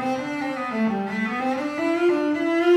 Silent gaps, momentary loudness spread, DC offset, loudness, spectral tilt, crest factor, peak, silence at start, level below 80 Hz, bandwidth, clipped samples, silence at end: none; 6 LU; under 0.1%; -24 LUFS; -6 dB/octave; 14 dB; -8 dBFS; 0 s; -66 dBFS; 11 kHz; under 0.1%; 0 s